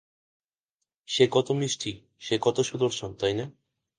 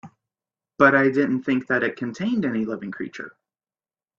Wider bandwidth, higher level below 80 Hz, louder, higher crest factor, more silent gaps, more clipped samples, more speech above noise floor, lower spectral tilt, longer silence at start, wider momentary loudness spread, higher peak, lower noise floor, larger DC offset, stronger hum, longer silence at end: first, 10 kHz vs 7.4 kHz; about the same, -62 dBFS vs -64 dBFS; second, -27 LUFS vs -22 LUFS; about the same, 22 dB vs 22 dB; neither; neither; second, 59 dB vs over 68 dB; second, -4.5 dB/octave vs -7 dB/octave; first, 1.1 s vs 0.05 s; second, 12 LU vs 17 LU; second, -6 dBFS vs 0 dBFS; second, -85 dBFS vs under -90 dBFS; neither; neither; second, 0.5 s vs 0.9 s